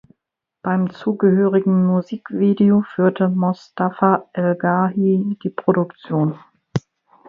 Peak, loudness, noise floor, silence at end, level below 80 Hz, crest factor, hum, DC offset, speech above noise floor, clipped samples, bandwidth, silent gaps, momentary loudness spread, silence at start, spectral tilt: 0 dBFS; -19 LUFS; -80 dBFS; 0.5 s; -64 dBFS; 18 dB; none; under 0.1%; 62 dB; under 0.1%; 6.4 kHz; none; 10 LU; 0.65 s; -9.5 dB/octave